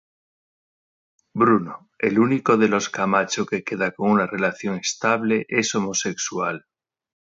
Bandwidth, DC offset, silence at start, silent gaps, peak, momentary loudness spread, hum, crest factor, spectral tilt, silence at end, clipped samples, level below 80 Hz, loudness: 7.8 kHz; under 0.1%; 1.35 s; none; -4 dBFS; 7 LU; none; 18 dB; -4 dB/octave; 0.8 s; under 0.1%; -64 dBFS; -21 LUFS